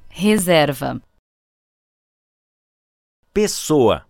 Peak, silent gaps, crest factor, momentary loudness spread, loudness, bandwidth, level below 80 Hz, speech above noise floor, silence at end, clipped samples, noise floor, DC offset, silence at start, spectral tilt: -2 dBFS; 1.19-3.23 s; 18 dB; 12 LU; -18 LUFS; 18 kHz; -48 dBFS; over 73 dB; 0.1 s; under 0.1%; under -90 dBFS; under 0.1%; 0.15 s; -4.5 dB/octave